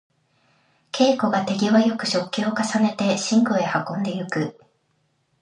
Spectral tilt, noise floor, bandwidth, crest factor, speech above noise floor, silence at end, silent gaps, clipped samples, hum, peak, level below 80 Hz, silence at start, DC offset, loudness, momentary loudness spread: -5 dB/octave; -68 dBFS; 10.5 kHz; 18 dB; 47 dB; 0.9 s; none; under 0.1%; none; -4 dBFS; -70 dBFS; 0.95 s; under 0.1%; -21 LUFS; 8 LU